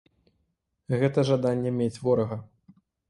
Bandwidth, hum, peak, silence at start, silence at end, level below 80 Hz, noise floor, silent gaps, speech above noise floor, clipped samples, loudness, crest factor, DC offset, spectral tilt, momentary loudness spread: 11 kHz; none; -10 dBFS; 0.9 s; 0.65 s; -60 dBFS; -76 dBFS; none; 51 dB; under 0.1%; -26 LUFS; 18 dB; under 0.1%; -7.5 dB/octave; 8 LU